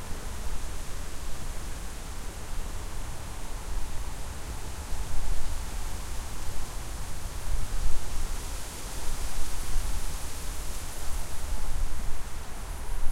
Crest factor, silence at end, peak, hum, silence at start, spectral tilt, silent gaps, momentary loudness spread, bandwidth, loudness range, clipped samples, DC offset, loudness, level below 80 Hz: 16 dB; 0 s; -8 dBFS; none; 0 s; -3.5 dB/octave; none; 4 LU; 15.5 kHz; 3 LU; under 0.1%; under 0.1%; -38 LUFS; -32 dBFS